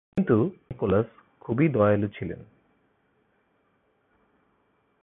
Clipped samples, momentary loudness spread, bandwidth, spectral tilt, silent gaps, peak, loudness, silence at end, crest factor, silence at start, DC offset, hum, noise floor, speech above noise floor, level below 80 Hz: under 0.1%; 15 LU; 3.9 kHz; -11 dB/octave; none; -8 dBFS; -25 LUFS; 2.6 s; 20 dB; 0.15 s; under 0.1%; none; -69 dBFS; 45 dB; -54 dBFS